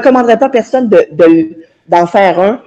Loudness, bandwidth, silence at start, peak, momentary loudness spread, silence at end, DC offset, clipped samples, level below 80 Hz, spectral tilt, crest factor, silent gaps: -9 LUFS; 8.2 kHz; 0 s; 0 dBFS; 4 LU; 0.1 s; under 0.1%; 0.5%; -54 dBFS; -6.5 dB/octave; 8 dB; none